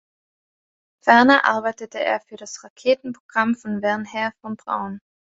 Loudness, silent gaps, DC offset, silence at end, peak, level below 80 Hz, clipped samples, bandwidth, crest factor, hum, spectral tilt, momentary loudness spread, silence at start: -20 LUFS; 2.70-2.76 s, 3.20-3.29 s; under 0.1%; 0.35 s; 0 dBFS; -66 dBFS; under 0.1%; 7.8 kHz; 22 dB; none; -4.5 dB/octave; 19 LU; 1.05 s